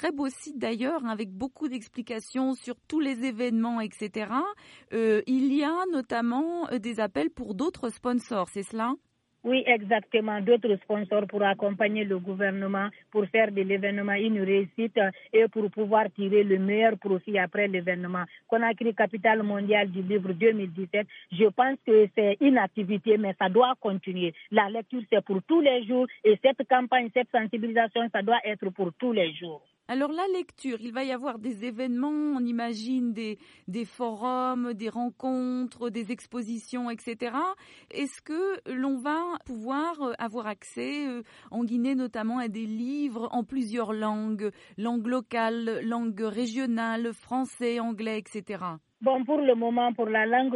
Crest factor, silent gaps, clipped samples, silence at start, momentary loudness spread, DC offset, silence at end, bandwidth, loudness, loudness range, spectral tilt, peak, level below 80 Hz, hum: 18 dB; none; under 0.1%; 0 s; 11 LU; under 0.1%; 0 s; 11.5 kHz; -28 LUFS; 7 LU; -6 dB/octave; -8 dBFS; -72 dBFS; none